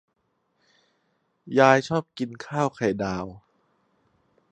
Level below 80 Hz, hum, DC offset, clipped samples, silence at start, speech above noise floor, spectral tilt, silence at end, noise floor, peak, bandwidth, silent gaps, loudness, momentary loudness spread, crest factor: -60 dBFS; none; under 0.1%; under 0.1%; 1.45 s; 48 dB; -6 dB/octave; 1.15 s; -72 dBFS; -2 dBFS; 9.4 kHz; none; -24 LUFS; 15 LU; 26 dB